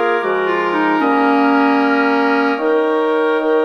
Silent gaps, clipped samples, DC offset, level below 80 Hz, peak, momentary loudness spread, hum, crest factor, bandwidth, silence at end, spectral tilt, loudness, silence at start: none; under 0.1%; under 0.1%; -60 dBFS; -4 dBFS; 3 LU; none; 12 dB; 6.6 kHz; 0 s; -6 dB/octave; -15 LUFS; 0 s